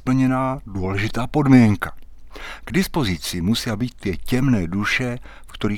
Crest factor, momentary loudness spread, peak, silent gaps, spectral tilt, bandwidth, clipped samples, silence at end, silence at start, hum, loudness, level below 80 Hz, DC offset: 18 dB; 16 LU; -2 dBFS; none; -6 dB/octave; 17 kHz; under 0.1%; 0 s; 0 s; none; -20 LUFS; -36 dBFS; under 0.1%